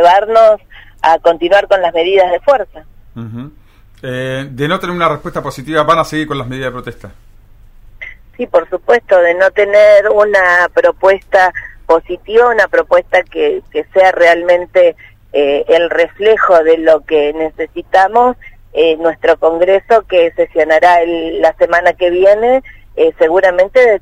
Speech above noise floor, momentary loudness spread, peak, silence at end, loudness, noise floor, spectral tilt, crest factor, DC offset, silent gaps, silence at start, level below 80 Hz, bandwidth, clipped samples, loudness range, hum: 29 dB; 13 LU; 0 dBFS; 0.05 s; -11 LUFS; -39 dBFS; -5 dB/octave; 12 dB; under 0.1%; none; 0 s; -40 dBFS; 11.5 kHz; 0.2%; 7 LU; none